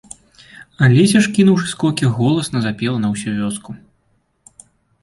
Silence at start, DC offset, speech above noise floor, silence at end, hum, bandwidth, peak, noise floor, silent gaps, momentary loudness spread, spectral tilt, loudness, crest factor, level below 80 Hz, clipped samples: 0.6 s; under 0.1%; 48 dB; 1.25 s; none; 11.5 kHz; -2 dBFS; -63 dBFS; none; 12 LU; -6 dB/octave; -16 LUFS; 16 dB; -52 dBFS; under 0.1%